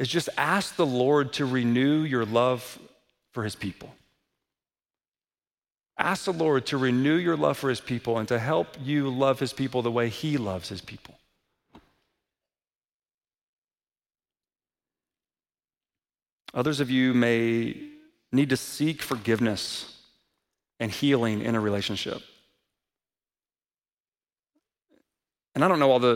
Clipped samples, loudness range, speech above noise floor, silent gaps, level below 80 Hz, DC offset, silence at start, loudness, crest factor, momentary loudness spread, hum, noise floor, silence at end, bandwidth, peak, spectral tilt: under 0.1%; 11 LU; over 65 dB; 5.08-5.12 s, 12.94-13.00 s, 13.14-13.18 s, 13.41-13.68 s, 16.32-16.36 s, 23.92-24.12 s; -66 dBFS; under 0.1%; 0 s; -26 LUFS; 24 dB; 13 LU; none; under -90 dBFS; 0 s; 16.5 kHz; -4 dBFS; -5.5 dB/octave